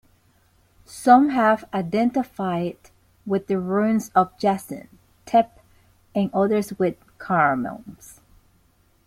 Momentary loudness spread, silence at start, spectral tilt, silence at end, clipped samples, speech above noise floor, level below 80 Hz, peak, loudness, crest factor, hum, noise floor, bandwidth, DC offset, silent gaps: 18 LU; 0.9 s; -6.5 dB/octave; 0.95 s; under 0.1%; 40 dB; -60 dBFS; -2 dBFS; -22 LUFS; 20 dB; none; -61 dBFS; 16 kHz; under 0.1%; none